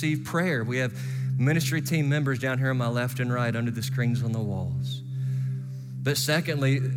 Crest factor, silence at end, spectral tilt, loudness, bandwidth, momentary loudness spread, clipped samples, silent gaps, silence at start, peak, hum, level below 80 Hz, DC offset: 14 dB; 0 s; -5.5 dB/octave; -27 LUFS; over 20 kHz; 7 LU; under 0.1%; none; 0 s; -12 dBFS; none; -66 dBFS; under 0.1%